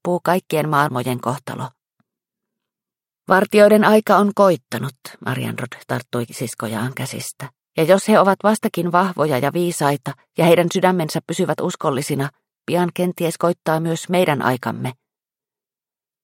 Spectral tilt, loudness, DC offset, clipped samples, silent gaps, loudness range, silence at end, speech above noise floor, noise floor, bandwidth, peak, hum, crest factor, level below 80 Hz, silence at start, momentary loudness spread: -5.5 dB/octave; -18 LUFS; under 0.1%; under 0.1%; none; 6 LU; 1.3 s; over 72 dB; under -90 dBFS; 17 kHz; 0 dBFS; none; 18 dB; -64 dBFS; 0.05 s; 15 LU